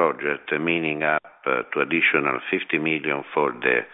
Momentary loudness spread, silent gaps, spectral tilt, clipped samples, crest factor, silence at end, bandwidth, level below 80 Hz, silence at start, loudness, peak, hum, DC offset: 6 LU; none; -8.5 dB/octave; under 0.1%; 18 dB; 0.05 s; 4 kHz; -68 dBFS; 0 s; -23 LUFS; -6 dBFS; none; under 0.1%